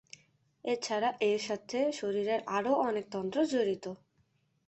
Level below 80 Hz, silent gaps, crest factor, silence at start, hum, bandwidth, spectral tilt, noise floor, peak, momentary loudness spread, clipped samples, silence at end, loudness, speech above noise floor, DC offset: -76 dBFS; none; 18 dB; 0.65 s; none; 8.4 kHz; -4.5 dB/octave; -73 dBFS; -16 dBFS; 8 LU; under 0.1%; 0.7 s; -32 LUFS; 41 dB; under 0.1%